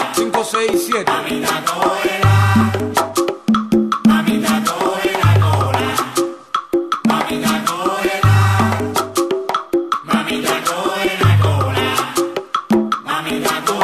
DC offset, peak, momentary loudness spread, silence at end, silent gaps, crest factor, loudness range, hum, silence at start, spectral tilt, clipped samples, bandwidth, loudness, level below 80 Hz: under 0.1%; -2 dBFS; 6 LU; 0 s; none; 14 dB; 2 LU; none; 0 s; -5.5 dB/octave; under 0.1%; 14.5 kHz; -16 LUFS; -42 dBFS